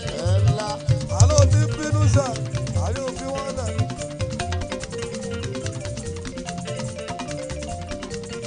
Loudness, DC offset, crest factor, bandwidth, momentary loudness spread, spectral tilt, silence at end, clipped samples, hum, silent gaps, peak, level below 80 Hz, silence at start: -24 LUFS; under 0.1%; 22 dB; 10 kHz; 13 LU; -5.5 dB/octave; 0 s; under 0.1%; none; none; -2 dBFS; -38 dBFS; 0 s